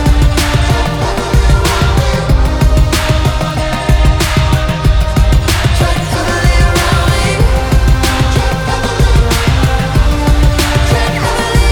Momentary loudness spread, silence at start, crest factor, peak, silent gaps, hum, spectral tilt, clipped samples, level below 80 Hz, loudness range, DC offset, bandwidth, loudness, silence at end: 3 LU; 0 s; 10 dB; 0 dBFS; none; none; -5 dB/octave; under 0.1%; -12 dBFS; 1 LU; under 0.1%; 19 kHz; -12 LUFS; 0 s